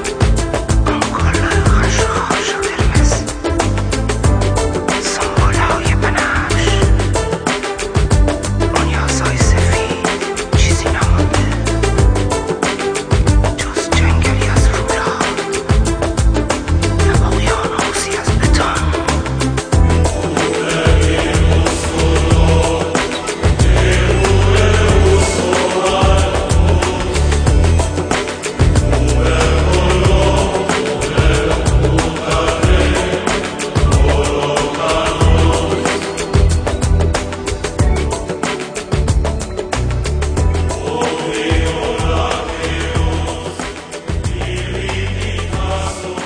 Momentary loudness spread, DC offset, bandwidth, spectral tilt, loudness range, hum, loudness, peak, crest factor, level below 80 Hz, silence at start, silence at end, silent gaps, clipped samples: 7 LU; under 0.1%; 10.5 kHz; -5 dB/octave; 5 LU; none; -15 LUFS; 0 dBFS; 14 dB; -18 dBFS; 0 s; 0 s; none; under 0.1%